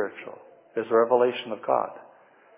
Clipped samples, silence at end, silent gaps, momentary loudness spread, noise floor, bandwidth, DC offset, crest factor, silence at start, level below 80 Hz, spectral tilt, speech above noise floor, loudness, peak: under 0.1%; 0.55 s; none; 16 LU; -55 dBFS; 3.8 kHz; under 0.1%; 20 dB; 0 s; -84 dBFS; -8.5 dB/octave; 31 dB; -25 LUFS; -8 dBFS